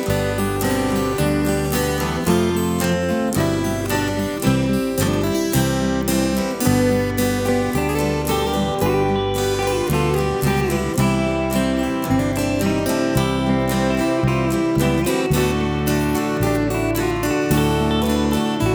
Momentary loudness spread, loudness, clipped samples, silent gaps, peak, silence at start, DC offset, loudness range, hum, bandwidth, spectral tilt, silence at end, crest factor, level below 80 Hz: 2 LU; -19 LUFS; under 0.1%; none; -4 dBFS; 0 s; under 0.1%; 1 LU; none; over 20 kHz; -5.5 dB/octave; 0 s; 16 dB; -34 dBFS